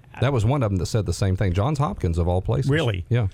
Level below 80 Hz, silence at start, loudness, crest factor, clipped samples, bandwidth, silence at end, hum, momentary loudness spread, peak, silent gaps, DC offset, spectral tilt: -38 dBFS; 0.15 s; -23 LUFS; 14 dB; under 0.1%; 13 kHz; 0.05 s; none; 3 LU; -8 dBFS; none; under 0.1%; -7 dB/octave